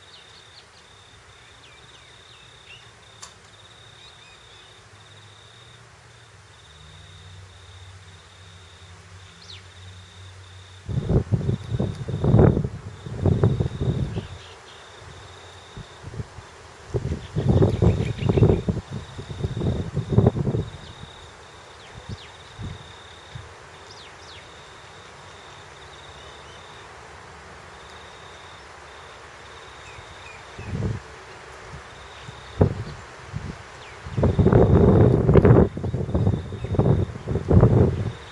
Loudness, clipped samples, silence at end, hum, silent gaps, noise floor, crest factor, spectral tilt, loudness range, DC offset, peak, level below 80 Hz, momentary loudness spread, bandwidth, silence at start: -22 LUFS; under 0.1%; 0 s; none; none; -49 dBFS; 24 dB; -8 dB/octave; 26 LU; under 0.1%; -2 dBFS; -38 dBFS; 27 LU; 11 kHz; 2.7 s